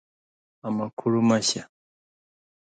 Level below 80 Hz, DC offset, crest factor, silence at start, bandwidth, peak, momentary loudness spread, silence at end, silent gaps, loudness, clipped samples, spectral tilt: -70 dBFS; under 0.1%; 18 dB; 0.65 s; 9.4 kHz; -10 dBFS; 11 LU; 1.05 s; 0.93-0.97 s; -25 LUFS; under 0.1%; -4.5 dB/octave